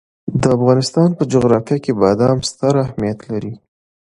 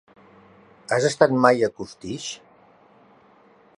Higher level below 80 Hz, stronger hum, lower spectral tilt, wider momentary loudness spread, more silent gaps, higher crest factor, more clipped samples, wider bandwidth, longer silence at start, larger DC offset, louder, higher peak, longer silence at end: first, -46 dBFS vs -64 dBFS; neither; first, -6.5 dB/octave vs -4.5 dB/octave; second, 10 LU vs 20 LU; neither; second, 16 dB vs 24 dB; neither; about the same, 11.5 kHz vs 11 kHz; second, 0.25 s vs 0.9 s; neither; first, -16 LUFS vs -21 LUFS; about the same, 0 dBFS vs -2 dBFS; second, 0.55 s vs 1.4 s